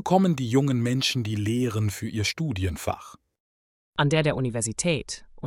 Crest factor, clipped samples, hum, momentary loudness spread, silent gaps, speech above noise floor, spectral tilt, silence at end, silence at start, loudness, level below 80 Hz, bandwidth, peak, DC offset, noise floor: 20 dB; under 0.1%; none; 8 LU; 3.40-3.93 s; over 65 dB; -5 dB/octave; 0 s; 0 s; -25 LUFS; -52 dBFS; 16.5 kHz; -6 dBFS; under 0.1%; under -90 dBFS